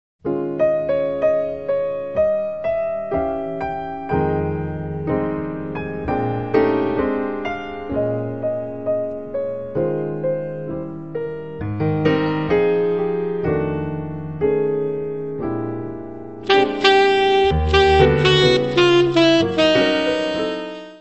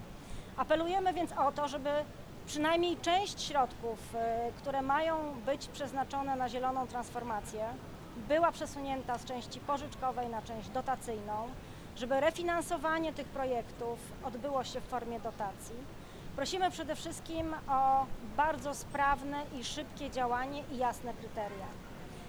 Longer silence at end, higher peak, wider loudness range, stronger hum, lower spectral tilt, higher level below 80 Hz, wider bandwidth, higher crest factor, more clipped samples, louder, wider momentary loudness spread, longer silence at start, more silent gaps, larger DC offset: about the same, 0 s vs 0 s; first, 0 dBFS vs -18 dBFS; first, 9 LU vs 5 LU; neither; first, -6 dB/octave vs -4 dB/octave; first, -38 dBFS vs -54 dBFS; second, 8.4 kHz vs over 20 kHz; about the same, 18 dB vs 18 dB; neither; first, -20 LUFS vs -35 LUFS; about the same, 13 LU vs 12 LU; first, 0.25 s vs 0 s; neither; first, 0.7% vs under 0.1%